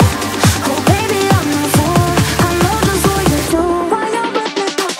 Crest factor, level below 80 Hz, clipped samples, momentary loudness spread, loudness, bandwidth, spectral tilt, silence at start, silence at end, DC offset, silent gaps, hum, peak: 14 dB; -30 dBFS; under 0.1%; 4 LU; -14 LUFS; 16.5 kHz; -4.5 dB/octave; 0 s; 0 s; under 0.1%; none; none; 0 dBFS